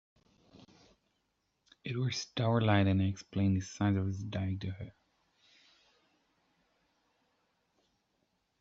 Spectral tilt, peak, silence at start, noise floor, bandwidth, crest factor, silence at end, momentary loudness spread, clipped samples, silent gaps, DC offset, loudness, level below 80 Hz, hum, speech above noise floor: -6 dB/octave; -14 dBFS; 1.85 s; -80 dBFS; 7.8 kHz; 22 dB; 3.7 s; 14 LU; under 0.1%; none; under 0.1%; -33 LUFS; -68 dBFS; none; 49 dB